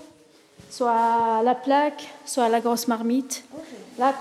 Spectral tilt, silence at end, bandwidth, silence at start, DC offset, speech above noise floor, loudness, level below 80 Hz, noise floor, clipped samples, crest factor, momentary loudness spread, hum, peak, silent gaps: -3.5 dB/octave; 0 s; 15 kHz; 0 s; under 0.1%; 31 dB; -23 LUFS; -74 dBFS; -54 dBFS; under 0.1%; 16 dB; 18 LU; none; -8 dBFS; none